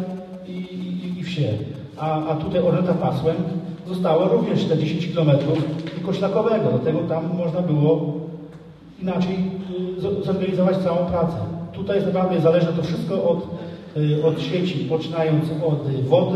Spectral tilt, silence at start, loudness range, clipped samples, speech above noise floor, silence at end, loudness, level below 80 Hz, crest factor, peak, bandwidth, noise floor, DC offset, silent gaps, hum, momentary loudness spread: -8.5 dB/octave; 0 s; 3 LU; under 0.1%; 21 dB; 0 s; -22 LUFS; -52 dBFS; 18 dB; -2 dBFS; 8.6 kHz; -42 dBFS; under 0.1%; none; none; 11 LU